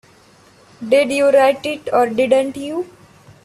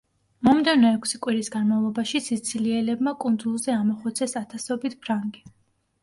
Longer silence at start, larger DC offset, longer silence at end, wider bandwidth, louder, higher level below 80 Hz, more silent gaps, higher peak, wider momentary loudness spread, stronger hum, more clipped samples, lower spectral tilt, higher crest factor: first, 0.8 s vs 0.4 s; neither; about the same, 0.6 s vs 0.55 s; about the same, 12.5 kHz vs 11.5 kHz; first, -16 LUFS vs -24 LUFS; about the same, -60 dBFS vs -64 dBFS; neither; first, -2 dBFS vs -6 dBFS; first, 14 LU vs 10 LU; neither; neither; about the same, -4 dB/octave vs -4 dB/octave; about the same, 16 dB vs 18 dB